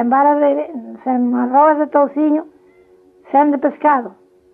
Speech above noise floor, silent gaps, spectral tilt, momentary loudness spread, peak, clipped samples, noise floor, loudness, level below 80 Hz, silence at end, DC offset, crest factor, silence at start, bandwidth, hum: 35 dB; none; -9 dB/octave; 9 LU; -2 dBFS; under 0.1%; -49 dBFS; -15 LUFS; -70 dBFS; 0.45 s; under 0.1%; 14 dB; 0 s; 3.5 kHz; none